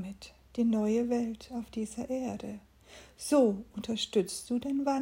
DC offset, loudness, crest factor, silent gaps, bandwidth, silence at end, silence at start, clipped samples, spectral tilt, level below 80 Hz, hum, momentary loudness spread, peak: under 0.1%; -32 LUFS; 18 dB; none; 16 kHz; 0 s; 0 s; under 0.1%; -5 dB/octave; -62 dBFS; none; 15 LU; -14 dBFS